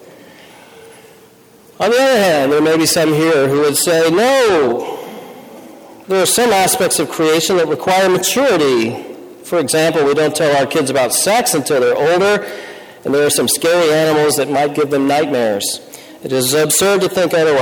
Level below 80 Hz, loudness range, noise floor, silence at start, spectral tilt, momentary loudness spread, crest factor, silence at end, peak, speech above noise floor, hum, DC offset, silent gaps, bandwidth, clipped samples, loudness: -54 dBFS; 2 LU; -44 dBFS; 0.8 s; -3 dB/octave; 9 LU; 10 dB; 0 s; -4 dBFS; 31 dB; none; under 0.1%; none; 19.5 kHz; under 0.1%; -13 LUFS